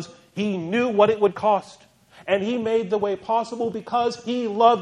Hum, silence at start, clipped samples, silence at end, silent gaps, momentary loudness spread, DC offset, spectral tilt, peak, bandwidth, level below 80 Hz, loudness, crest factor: none; 0 s; under 0.1%; 0 s; none; 9 LU; under 0.1%; -6 dB/octave; -2 dBFS; 10.5 kHz; -66 dBFS; -23 LUFS; 20 dB